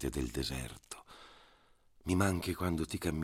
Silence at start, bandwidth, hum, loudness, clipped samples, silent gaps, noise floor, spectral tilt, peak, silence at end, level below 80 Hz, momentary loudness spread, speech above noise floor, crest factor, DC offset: 0 s; 16 kHz; none; -36 LUFS; under 0.1%; none; -66 dBFS; -5 dB/octave; -18 dBFS; 0 s; -50 dBFS; 21 LU; 31 dB; 20 dB; under 0.1%